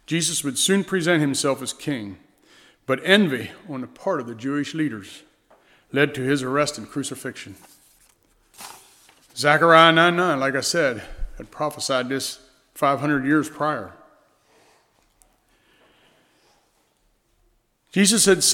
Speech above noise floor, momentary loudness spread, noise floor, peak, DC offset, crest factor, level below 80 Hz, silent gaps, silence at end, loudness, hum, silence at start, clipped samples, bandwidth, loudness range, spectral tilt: 44 dB; 23 LU; -65 dBFS; 0 dBFS; under 0.1%; 24 dB; -48 dBFS; none; 0 s; -21 LUFS; none; 0.1 s; under 0.1%; 19 kHz; 9 LU; -3.5 dB/octave